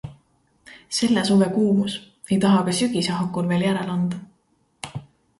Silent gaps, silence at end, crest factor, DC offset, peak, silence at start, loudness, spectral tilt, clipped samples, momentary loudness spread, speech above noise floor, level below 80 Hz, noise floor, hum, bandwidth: none; 0.4 s; 16 dB; under 0.1%; -6 dBFS; 0.05 s; -21 LUFS; -5.5 dB/octave; under 0.1%; 17 LU; 45 dB; -58 dBFS; -65 dBFS; none; 11.5 kHz